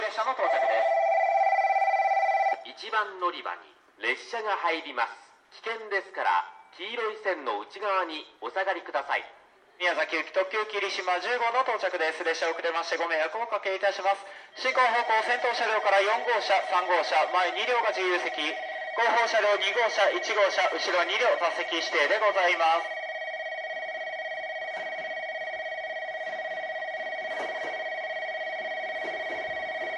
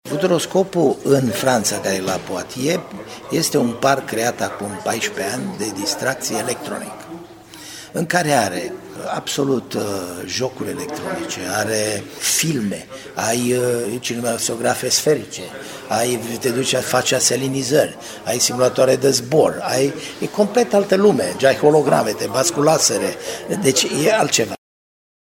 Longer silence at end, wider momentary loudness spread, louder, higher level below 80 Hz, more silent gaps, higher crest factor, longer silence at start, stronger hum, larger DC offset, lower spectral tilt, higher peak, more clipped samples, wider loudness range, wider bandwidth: second, 0 s vs 0.75 s; about the same, 10 LU vs 12 LU; second, -27 LUFS vs -19 LUFS; second, -80 dBFS vs -58 dBFS; neither; about the same, 18 dB vs 20 dB; about the same, 0 s vs 0.05 s; neither; neither; second, -0.5 dB/octave vs -3.5 dB/octave; second, -10 dBFS vs 0 dBFS; neither; about the same, 8 LU vs 6 LU; second, 10.5 kHz vs 17 kHz